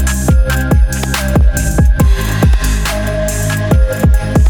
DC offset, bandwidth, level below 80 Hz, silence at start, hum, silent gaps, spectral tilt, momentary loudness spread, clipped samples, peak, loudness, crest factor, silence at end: under 0.1%; 19 kHz; -12 dBFS; 0 s; none; none; -5.5 dB/octave; 4 LU; under 0.1%; 0 dBFS; -13 LUFS; 10 dB; 0 s